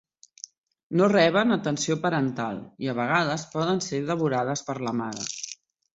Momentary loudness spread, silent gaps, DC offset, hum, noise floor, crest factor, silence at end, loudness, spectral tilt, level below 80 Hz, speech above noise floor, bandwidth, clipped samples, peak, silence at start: 17 LU; none; under 0.1%; none; -47 dBFS; 20 dB; 0.4 s; -25 LUFS; -5 dB/octave; -66 dBFS; 22 dB; 8.2 kHz; under 0.1%; -6 dBFS; 0.9 s